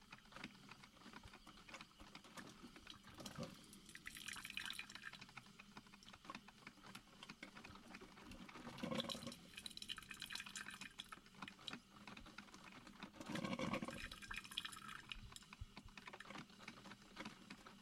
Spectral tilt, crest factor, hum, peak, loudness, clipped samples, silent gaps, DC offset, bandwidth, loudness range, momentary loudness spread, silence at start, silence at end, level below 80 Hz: -3 dB/octave; 28 dB; none; -28 dBFS; -53 LUFS; under 0.1%; none; under 0.1%; 16 kHz; 8 LU; 12 LU; 0 s; 0 s; -70 dBFS